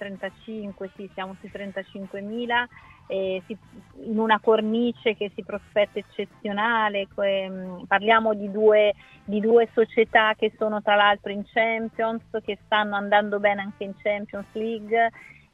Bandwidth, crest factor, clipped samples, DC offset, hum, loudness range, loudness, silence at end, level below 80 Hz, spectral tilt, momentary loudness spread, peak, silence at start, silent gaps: 5.4 kHz; 20 dB; under 0.1%; under 0.1%; none; 9 LU; -24 LUFS; 0.3 s; -62 dBFS; -6.5 dB/octave; 16 LU; -4 dBFS; 0 s; none